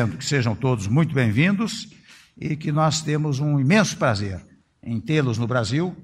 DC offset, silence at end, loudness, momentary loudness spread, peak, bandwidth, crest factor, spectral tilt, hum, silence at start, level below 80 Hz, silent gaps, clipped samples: under 0.1%; 0 s; -22 LUFS; 13 LU; -4 dBFS; 12.5 kHz; 18 dB; -5.5 dB/octave; none; 0 s; -54 dBFS; none; under 0.1%